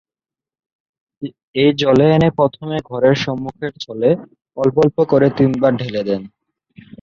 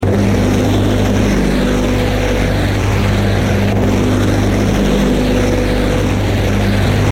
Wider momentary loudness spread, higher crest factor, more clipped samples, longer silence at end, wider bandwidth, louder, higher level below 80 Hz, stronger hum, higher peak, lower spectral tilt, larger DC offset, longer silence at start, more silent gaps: first, 13 LU vs 2 LU; about the same, 16 dB vs 12 dB; neither; first, 0.75 s vs 0 s; second, 7.4 kHz vs 16 kHz; about the same, -16 LUFS vs -14 LUFS; second, -50 dBFS vs -20 dBFS; neither; about the same, -2 dBFS vs -2 dBFS; about the same, -7.5 dB/octave vs -6.5 dB/octave; neither; first, 1.2 s vs 0 s; first, 1.43-1.54 s vs none